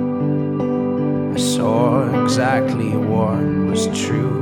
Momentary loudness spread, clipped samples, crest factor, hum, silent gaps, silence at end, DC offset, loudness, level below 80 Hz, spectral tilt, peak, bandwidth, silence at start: 4 LU; under 0.1%; 14 dB; none; none; 0 s; under 0.1%; -18 LUFS; -50 dBFS; -6 dB/octave; -4 dBFS; 17 kHz; 0 s